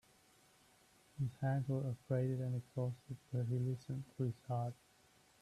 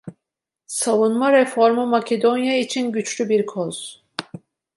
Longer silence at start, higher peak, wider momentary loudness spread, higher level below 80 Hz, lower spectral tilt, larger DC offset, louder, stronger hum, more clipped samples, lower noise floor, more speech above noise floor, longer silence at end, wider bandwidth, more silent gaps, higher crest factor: first, 1.15 s vs 0.05 s; second, -26 dBFS vs -4 dBFS; second, 8 LU vs 16 LU; about the same, -74 dBFS vs -72 dBFS; first, -9 dB/octave vs -4 dB/octave; neither; second, -41 LUFS vs -19 LUFS; neither; neither; second, -70 dBFS vs -84 dBFS; second, 30 dB vs 65 dB; first, 0.7 s vs 0.4 s; about the same, 12 kHz vs 12 kHz; neither; about the same, 16 dB vs 18 dB